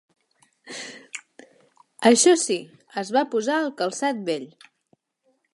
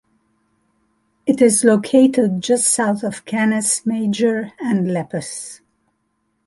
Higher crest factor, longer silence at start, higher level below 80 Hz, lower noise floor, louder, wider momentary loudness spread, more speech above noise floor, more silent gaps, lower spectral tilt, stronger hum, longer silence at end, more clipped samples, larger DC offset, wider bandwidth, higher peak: first, 22 dB vs 16 dB; second, 0.65 s vs 1.25 s; second, -82 dBFS vs -62 dBFS; about the same, -70 dBFS vs -69 dBFS; second, -22 LUFS vs -17 LUFS; first, 22 LU vs 13 LU; second, 48 dB vs 52 dB; neither; second, -2.5 dB/octave vs -4.5 dB/octave; neither; first, 1.1 s vs 0.9 s; neither; neither; about the same, 11.5 kHz vs 12 kHz; about the same, -2 dBFS vs -2 dBFS